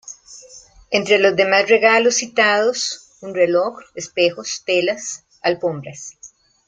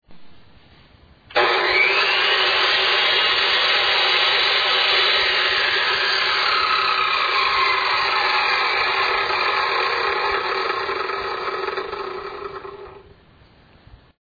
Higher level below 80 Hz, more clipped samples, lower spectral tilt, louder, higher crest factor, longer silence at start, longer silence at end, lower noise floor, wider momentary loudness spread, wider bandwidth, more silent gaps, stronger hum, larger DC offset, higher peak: second, -62 dBFS vs -54 dBFS; neither; about the same, -2.5 dB/octave vs -2 dB/octave; about the same, -17 LUFS vs -17 LUFS; about the same, 18 dB vs 14 dB; about the same, 0.05 s vs 0.1 s; second, 0.4 s vs 1.2 s; second, -45 dBFS vs -51 dBFS; first, 18 LU vs 10 LU; first, 9.6 kHz vs 5 kHz; neither; neither; neither; first, -2 dBFS vs -6 dBFS